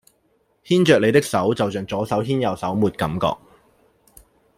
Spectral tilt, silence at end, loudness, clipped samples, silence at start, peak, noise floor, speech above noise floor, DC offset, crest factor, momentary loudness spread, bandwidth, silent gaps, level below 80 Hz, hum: -6 dB/octave; 1.2 s; -20 LUFS; under 0.1%; 0.65 s; -2 dBFS; -64 dBFS; 45 dB; under 0.1%; 20 dB; 9 LU; 16 kHz; none; -52 dBFS; none